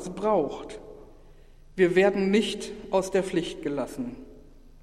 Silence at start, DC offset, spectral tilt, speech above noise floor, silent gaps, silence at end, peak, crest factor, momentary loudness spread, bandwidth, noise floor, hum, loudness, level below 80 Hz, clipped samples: 0 s; under 0.1%; -5.5 dB/octave; 24 dB; none; 0.05 s; -8 dBFS; 20 dB; 19 LU; 13 kHz; -50 dBFS; none; -26 LUFS; -50 dBFS; under 0.1%